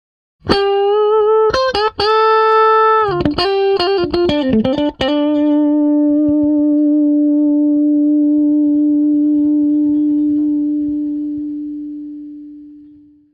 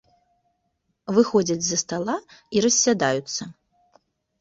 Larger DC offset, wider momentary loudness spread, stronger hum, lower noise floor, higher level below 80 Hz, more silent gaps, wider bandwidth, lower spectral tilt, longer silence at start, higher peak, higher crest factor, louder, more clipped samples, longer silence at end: neither; about the same, 11 LU vs 13 LU; neither; second, -43 dBFS vs -74 dBFS; first, -42 dBFS vs -62 dBFS; neither; second, 6.6 kHz vs 8 kHz; first, -6.5 dB/octave vs -3 dB/octave; second, 0.45 s vs 1.1 s; first, 0 dBFS vs -6 dBFS; second, 14 dB vs 20 dB; first, -14 LUFS vs -22 LUFS; neither; second, 0.5 s vs 0.9 s